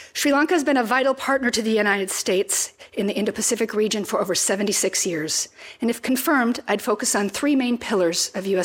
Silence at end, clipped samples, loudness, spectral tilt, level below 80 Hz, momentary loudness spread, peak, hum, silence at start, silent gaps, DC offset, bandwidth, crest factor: 0 s; under 0.1%; -21 LUFS; -2.5 dB/octave; -64 dBFS; 5 LU; -6 dBFS; none; 0 s; none; under 0.1%; 17 kHz; 16 dB